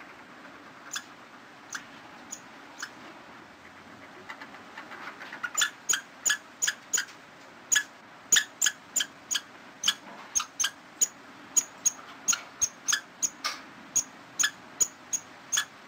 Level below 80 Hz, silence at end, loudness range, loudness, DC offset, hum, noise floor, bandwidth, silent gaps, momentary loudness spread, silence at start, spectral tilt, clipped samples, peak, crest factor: -72 dBFS; 0 s; 16 LU; -28 LUFS; under 0.1%; none; -50 dBFS; 16 kHz; none; 22 LU; 0 s; 2 dB/octave; under 0.1%; -8 dBFS; 26 dB